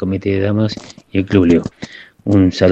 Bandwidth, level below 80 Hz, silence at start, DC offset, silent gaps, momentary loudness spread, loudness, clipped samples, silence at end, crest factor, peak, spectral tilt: 8.2 kHz; -44 dBFS; 0 s; under 0.1%; none; 17 LU; -15 LUFS; under 0.1%; 0 s; 14 dB; 0 dBFS; -7.5 dB/octave